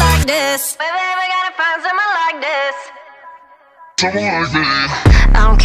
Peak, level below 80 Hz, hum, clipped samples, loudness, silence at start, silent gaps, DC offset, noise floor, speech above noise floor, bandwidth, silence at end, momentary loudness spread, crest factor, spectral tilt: 0 dBFS; -18 dBFS; none; under 0.1%; -15 LUFS; 0 s; none; under 0.1%; -43 dBFS; 32 dB; 15.5 kHz; 0 s; 7 LU; 14 dB; -4 dB/octave